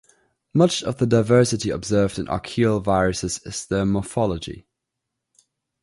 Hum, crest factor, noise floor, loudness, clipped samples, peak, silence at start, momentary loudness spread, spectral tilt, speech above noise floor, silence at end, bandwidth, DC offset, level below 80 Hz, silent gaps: none; 18 dB; -81 dBFS; -21 LUFS; under 0.1%; -4 dBFS; 0.55 s; 10 LU; -5.5 dB/octave; 61 dB; 1.2 s; 11.5 kHz; under 0.1%; -44 dBFS; none